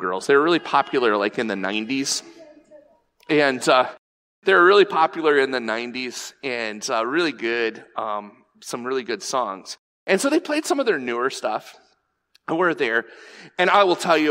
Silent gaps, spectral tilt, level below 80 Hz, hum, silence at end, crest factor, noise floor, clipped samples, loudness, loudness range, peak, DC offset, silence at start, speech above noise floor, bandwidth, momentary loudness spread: 3.98-4.42 s, 9.79-10.06 s; -3.5 dB/octave; -74 dBFS; none; 0 s; 18 dB; -66 dBFS; under 0.1%; -21 LUFS; 7 LU; -4 dBFS; under 0.1%; 0 s; 45 dB; 16 kHz; 14 LU